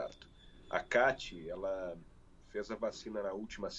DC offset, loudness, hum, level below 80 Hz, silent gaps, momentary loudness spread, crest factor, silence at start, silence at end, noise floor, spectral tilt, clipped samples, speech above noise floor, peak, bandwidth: under 0.1%; -38 LUFS; none; -60 dBFS; none; 15 LU; 22 dB; 0 s; 0 s; -58 dBFS; -4 dB/octave; under 0.1%; 21 dB; -18 dBFS; 8.2 kHz